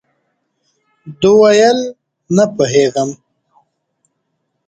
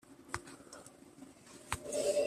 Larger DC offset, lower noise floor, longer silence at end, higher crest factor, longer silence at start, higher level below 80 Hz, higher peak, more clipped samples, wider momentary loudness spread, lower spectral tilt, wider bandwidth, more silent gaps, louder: neither; first, -69 dBFS vs -57 dBFS; first, 1.55 s vs 0 s; second, 16 dB vs 24 dB; first, 1.05 s vs 0.1 s; first, -56 dBFS vs -64 dBFS; first, 0 dBFS vs -16 dBFS; neither; second, 12 LU vs 20 LU; first, -5 dB/octave vs -3 dB/octave; second, 9 kHz vs 14.5 kHz; neither; first, -12 LUFS vs -41 LUFS